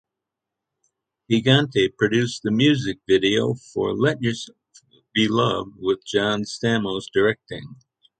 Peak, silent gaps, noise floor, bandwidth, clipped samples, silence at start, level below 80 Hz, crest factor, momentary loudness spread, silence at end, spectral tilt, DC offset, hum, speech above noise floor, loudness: -2 dBFS; none; -85 dBFS; 9.2 kHz; under 0.1%; 1.3 s; -56 dBFS; 20 dB; 8 LU; 0.45 s; -5.5 dB/octave; under 0.1%; none; 63 dB; -21 LUFS